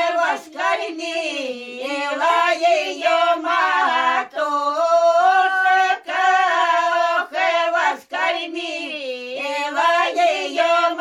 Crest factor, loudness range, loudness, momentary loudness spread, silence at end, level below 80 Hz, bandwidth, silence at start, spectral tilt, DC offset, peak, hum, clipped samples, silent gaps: 14 dB; 4 LU; -19 LUFS; 10 LU; 0 s; -70 dBFS; 13 kHz; 0 s; -0.5 dB/octave; under 0.1%; -6 dBFS; none; under 0.1%; none